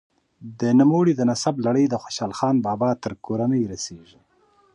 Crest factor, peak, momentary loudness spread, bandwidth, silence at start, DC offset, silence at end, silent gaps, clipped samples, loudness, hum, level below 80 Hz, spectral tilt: 16 dB; -6 dBFS; 11 LU; 10.5 kHz; 0.4 s; under 0.1%; 0.75 s; none; under 0.1%; -22 LUFS; none; -60 dBFS; -6.5 dB/octave